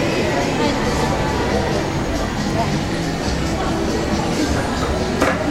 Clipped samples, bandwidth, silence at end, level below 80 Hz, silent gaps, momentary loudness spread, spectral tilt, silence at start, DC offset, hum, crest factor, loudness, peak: under 0.1%; 16 kHz; 0 s; -30 dBFS; none; 3 LU; -5 dB/octave; 0 s; under 0.1%; none; 16 dB; -20 LUFS; -2 dBFS